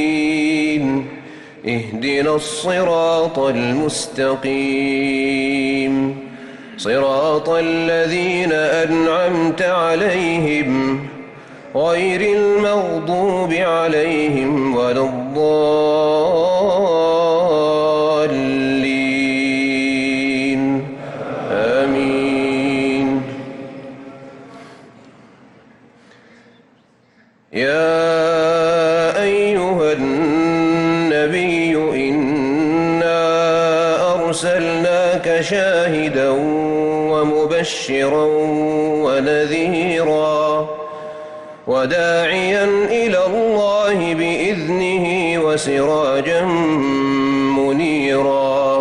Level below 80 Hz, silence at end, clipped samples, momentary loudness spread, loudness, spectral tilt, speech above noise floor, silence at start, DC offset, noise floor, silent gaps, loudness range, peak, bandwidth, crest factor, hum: -52 dBFS; 0 s; under 0.1%; 6 LU; -16 LUFS; -5 dB/octave; 37 dB; 0 s; under 0.1%; -53 dBFS; none; 3 LU; -6 dBFS; 11.5 kHz; 10 dB; none